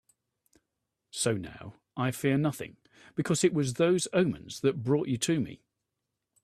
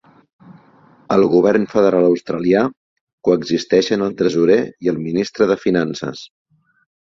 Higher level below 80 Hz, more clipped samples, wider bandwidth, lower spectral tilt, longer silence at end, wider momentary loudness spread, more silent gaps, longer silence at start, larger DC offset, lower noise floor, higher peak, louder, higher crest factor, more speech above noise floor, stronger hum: second, -66 dBFS vs -56 dBFS; neither; first, 14.5 kHz vs 7.6 kHz; about the same, -5 dB/octave vs -6 dB/octave; about the same, 0.9 s vs 0.85 s; first, 15 LU vs 9 LU; second, none vs 2.77-3.07 s, 3.13-3.18 s; first, 1.15 s vs 0.5 s; neither; first, -85 dBFS vs -50 dBFS; second, -12 dBFS vs -2 dBFS; second, -29 LUFS vs -17 LUFS; about the same, 20 dB vs 16 dB; first, 56 dB vs 34 dB; neither